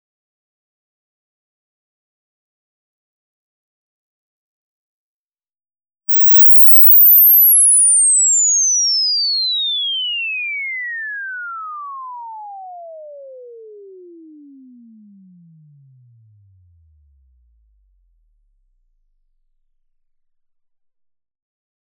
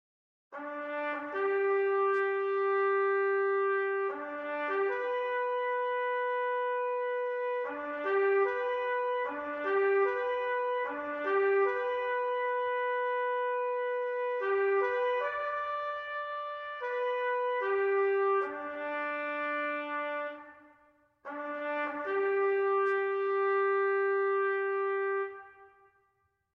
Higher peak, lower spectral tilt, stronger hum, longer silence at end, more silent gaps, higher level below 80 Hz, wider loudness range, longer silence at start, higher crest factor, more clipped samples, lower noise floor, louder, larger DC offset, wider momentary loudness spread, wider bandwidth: first, 0 dBFS vs -20 dBFS; second, 3 dB/octave vs -5 dB/octave; neither; first, 8.7 s vs 0.85 s; neither; first, -66 dBFS vs -80 dBFS; first, 21 LU vs 3 LU; first, 6.1 s vs 0.5 s; about the same, 16 dB vs 12 dB; neither; first, under -90 dBFS vs -76 dBFS; first, -7 LUFS vs -31 LUFS; neither; first, 25 LU vs 8 LU; second, 3.1 kHz vs 4.6 kHz